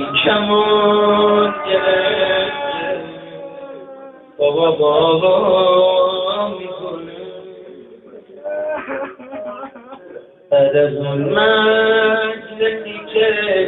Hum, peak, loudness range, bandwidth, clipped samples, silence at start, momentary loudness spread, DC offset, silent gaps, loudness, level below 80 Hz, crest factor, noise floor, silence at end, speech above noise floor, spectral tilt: none; 0 dBFS; 12 LU; 4.2 kHz; under 0.1%; 0 s; 20 LU; under 0.1%; none; -15 LUFS; -56 dBFS; 16 dB; -39 dBFS; 0 s; 25 dB; -9.5 dB/octave